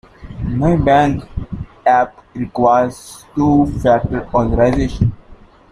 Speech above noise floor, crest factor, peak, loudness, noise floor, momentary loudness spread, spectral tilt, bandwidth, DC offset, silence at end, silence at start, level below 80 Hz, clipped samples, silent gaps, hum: 27 dB; 14 dB; -2 dBFS; -15 LUFS; -42 dBFS; 14 LU; -8 dB/octave; 14 kHz; under 0.1%; 0.35 s; 0.2 s; -30 dBFS; under 0.1%; none; none